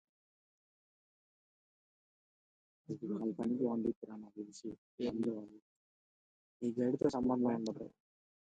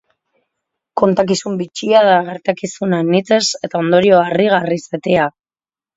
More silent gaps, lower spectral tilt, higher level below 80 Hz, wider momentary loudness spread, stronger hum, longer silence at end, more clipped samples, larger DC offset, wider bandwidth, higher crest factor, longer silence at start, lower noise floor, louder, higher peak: first, 3.96-4.02 s, 4.78-4.98 s, 5.62-6.60 s vs none; first, -7.5 dB/octave vs -5 dB/octave; second, -72 dBFS vs -58 dBFS; first, 15 LU vs 10 LU; neither; about the same, 0.65 s vs 0.65 s; neither; neither; first, 9 kHz vs 8 kHz; first, 22 dB vs 16 dB; first, 2.9 s vs 0.95 s; about the same, under -90 dBFS vs under -90 dBFS; second, -38 LUFS vs -15 LUFS; second, -20 dBFS vs 0 dBFS